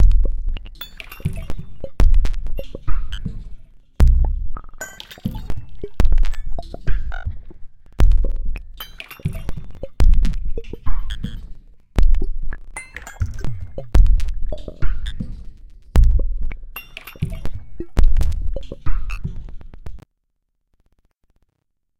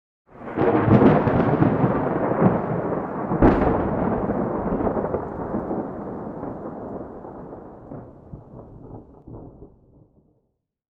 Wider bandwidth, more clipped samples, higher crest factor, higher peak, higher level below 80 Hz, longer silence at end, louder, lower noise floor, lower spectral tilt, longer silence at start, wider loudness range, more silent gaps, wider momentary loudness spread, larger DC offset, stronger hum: first, 13 kHz vs 5.4 kHz; neither; about the same, 16 dB vs 18 dB; first, 0 dBFS vs -4 dBFS; first, -20 dBFS vs -38 dBFS; second, 0 s vs 1.3 s; second, -25 LUFS vs -22 LUFS; about the same, -73 dBFS vs -73 dBFS; second, -6.5 dB/octave vs -11 dB/octave; second, 0 s vs 0.35 s; second, 4 LU vs 22 LU; neither; second, 16 LU vs 24 LU; first, 2% vs under 0.1%; neither